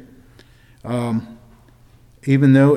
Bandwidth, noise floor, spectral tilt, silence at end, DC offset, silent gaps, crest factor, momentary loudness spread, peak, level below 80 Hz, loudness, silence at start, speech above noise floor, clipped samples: 10 kHz; -49 dBFS; -8.5 dB/octave; 0 s; under 0.1%; none; 16 dB; 23 LU; -2 dBFS; -54 dBFS; -18 LUFS; 0.85 s; 34 dB; under 0.1%